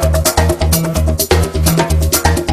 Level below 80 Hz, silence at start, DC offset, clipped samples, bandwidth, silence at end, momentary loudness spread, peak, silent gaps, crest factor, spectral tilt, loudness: -20 dBFS; 0 s; under 0.1%; under 0.1%; 15.5 kHz; 0 s; 1 LU; 0 dBFS; none; 12 dB; -4.5 dB/octave; -13 LUFS